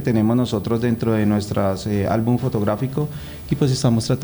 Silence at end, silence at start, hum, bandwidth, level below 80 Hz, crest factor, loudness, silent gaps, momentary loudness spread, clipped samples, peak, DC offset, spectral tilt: 0 s; 0 s; none; over 20 kHz; -44 dBFS; 14 dB; -20 LUFS; none; 6 LU; under 0.1%; -6 dBFS; under 0.1%; -7 dB/octave